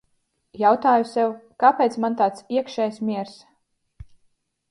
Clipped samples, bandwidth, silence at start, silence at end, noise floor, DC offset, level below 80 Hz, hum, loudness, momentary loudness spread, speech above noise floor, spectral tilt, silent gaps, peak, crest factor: under 0.1%; 11.5 kHz; 0.55 s; 0.7 s; -69 dBFS; under 0.1%; -58 dBFS; none; -21 LUFS; 10 LU; 49 dB; -6 dB/octave; none; -2 dBFS; 20 dB